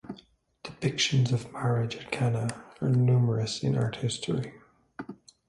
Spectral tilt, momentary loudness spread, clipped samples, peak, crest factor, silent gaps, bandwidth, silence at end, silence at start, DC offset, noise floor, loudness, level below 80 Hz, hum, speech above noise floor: -5.5 dB/octave; 20 LU; under 0.1%; -14 dBFS; 16 dB; none; 11.5 kHz; 0.35 s; 0.05 s; under 0.1%; -58 dBFS; -28 LUFS; -60 dBFS; none; 31 dB